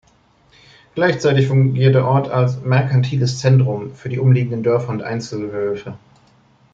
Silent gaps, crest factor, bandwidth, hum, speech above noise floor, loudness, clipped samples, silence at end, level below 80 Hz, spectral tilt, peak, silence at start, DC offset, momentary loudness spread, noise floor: none; 14 dB; 7.4 kHz; none; 39 dB; -17 LUFS; under 0.1%; 0.75 s; -56 dBFS; -7.5 dB/octave; -2 dBFS; 0.95 s; under 0.1%; 11 LU; -55 dBFS